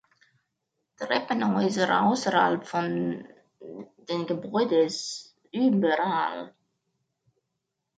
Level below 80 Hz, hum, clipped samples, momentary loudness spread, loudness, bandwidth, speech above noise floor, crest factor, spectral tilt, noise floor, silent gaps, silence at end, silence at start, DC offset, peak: -74 dBFS; none; under 0.1%; 16 LU; -26 LUFS; 9.2 kHz; 56 dB; 18 dB; -5 dB/octave; -82 dBFS; none; 1.5 s; 1 s; under 0.1%; -8 dBFS